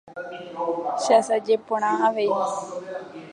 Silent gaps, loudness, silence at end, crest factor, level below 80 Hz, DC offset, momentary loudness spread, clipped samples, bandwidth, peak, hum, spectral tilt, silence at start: none; -23 LUFS; 0 s; 18 dB; -76 dBFS; under 0.1%; 16 LU; under 0.1%; 11 kHz; -6 dBFS; none; -3.5 dB/octave; 0.05 s